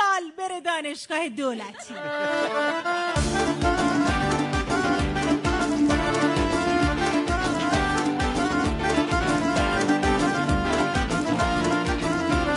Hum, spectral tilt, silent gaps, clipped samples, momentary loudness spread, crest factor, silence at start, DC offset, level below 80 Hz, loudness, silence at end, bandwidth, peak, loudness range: none; -5 dB/octave; none; under 0.1%; 6 LU; 14 dB; 0 s; under 0.1%; -36 dBFS; -24 LUFS; 0 s; 11 kHz; -8 dBFS; 2 LU